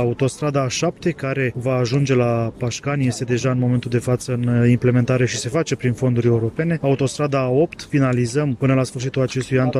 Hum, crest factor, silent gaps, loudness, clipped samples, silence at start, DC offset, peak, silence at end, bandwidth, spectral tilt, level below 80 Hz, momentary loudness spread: none; 14 dB; none; -20 LUFS; under 0.1%; 0 s; under 0.1%; -6 dBFS; 0 s; 12 kHz; -6.5 dB/octave; -50 dBFS; 5 LU